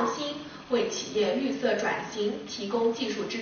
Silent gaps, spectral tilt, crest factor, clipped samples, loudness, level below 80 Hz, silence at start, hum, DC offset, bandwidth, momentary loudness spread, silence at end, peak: none; -2.5 dB/octave; 16 dB; under 0.1%; -29 LUFS; -64 dBFS; 0 s; none; under 0.1%; 6.8 kHz; 6 LU; 0 s; -12 dBFS